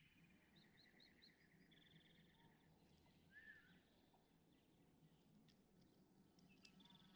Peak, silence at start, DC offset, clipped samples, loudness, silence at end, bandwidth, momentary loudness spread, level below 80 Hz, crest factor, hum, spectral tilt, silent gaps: -46 dBFS; 0 s; under 0.1%; under 0.1%; -67 LUFS; 0 s; over 20 kHz; 4 LU; -88 dBFS; 26 dB; none; -4.5 dB/octave; none